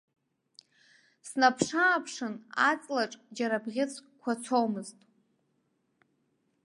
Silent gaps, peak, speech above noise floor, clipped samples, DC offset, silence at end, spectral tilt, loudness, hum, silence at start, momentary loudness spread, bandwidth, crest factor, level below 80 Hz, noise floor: none; -8 dBFS; 46 dB; under 0.1%; under 0.1%; 1.75 s; -3.5 dB/octave; -30 LUFS; none; 1.25 s; 13 LU; 11.5 kHz; 24 dB; -78 dBFS; -75 dBFS